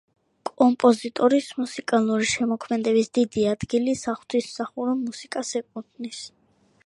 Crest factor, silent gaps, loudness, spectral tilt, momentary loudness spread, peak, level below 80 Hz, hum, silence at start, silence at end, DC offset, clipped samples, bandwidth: 20 dB; none; -23 LUFS; -4.5 dB/octave; 15 LU; -4 dBFS; -60 dBFS; none; 0.45 s; 0.6 s; under 0.1%; under 0.1%; 11.5 kHz